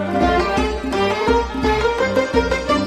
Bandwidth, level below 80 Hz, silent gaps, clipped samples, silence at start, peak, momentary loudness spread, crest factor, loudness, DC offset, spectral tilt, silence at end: 15 kHz; -30 dBFS; none; under 0.1%; 0 s; -4 dBFS; 3 LU; 14 dB; -18 LUFS; under 0.1%; -5.5 dB/octave; 0 s